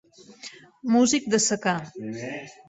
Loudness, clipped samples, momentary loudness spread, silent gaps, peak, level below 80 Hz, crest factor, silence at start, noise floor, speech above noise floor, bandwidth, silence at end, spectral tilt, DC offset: -23 LUFS; under 0.1%; 22 LU; none; -8 dBFS; -66 dBFS; 18 dB; 0.3 s; -46 dBFS; 21 dB; 8.2 kHz; 0.15 s; -3.5 dB/octave; under 0.1%